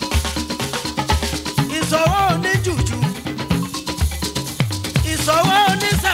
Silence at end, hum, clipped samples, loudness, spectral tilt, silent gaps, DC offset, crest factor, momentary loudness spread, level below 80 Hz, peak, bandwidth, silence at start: 0 s; none; under 0.1%; -19 LUFS; -4 dB/octave; none; under 0.1%; 18 dB; 8 LU; -30 dBFS; -2 dBFS; 16 kHz; 0 s